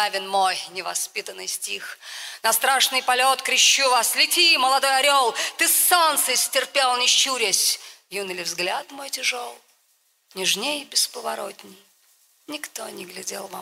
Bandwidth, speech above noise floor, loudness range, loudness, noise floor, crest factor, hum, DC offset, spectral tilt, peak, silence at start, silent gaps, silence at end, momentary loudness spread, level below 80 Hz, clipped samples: 16 kHz; 42 dB; 10 LU; -19 LUFS; -65 dBFS; 20 dB; none; under 0.1%; 1 dB/octave; -4 dBFS; 0 s; none; 0 s; 17 LU; -78 dBFS; under 0.1%